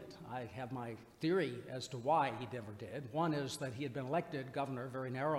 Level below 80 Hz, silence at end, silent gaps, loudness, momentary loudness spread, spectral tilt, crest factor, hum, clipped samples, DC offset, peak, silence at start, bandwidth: -74 dBFS; 0 s; none; -40 LUFS; 11 LU; -6 dB/octave; 18 dB; none; under 0.1%; under 0.1%; -22 dBFS; 0 s; 16 kHz